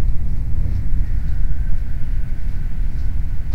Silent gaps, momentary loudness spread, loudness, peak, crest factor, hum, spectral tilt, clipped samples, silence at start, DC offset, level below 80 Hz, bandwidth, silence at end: none; 3 LU; -26 LUFS; -4 dBFS; 12 dB; none; -8.5 dB/octave; under 0.1%; 0 s; 6%; -18 dBFS; 2.4 kHz; 0 s